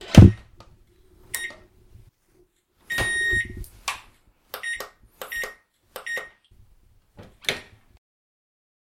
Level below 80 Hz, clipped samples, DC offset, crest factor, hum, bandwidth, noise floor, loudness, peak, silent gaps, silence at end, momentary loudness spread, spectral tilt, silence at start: -36 dBFS; under 0.1%; under 0.1%; 24 dB; none; 16.5 kHz; -62 dBFS; -24 LUFS; 0 dBFS; none; 1.35 s; 21 LU; -5.5 dB/octave; 0 s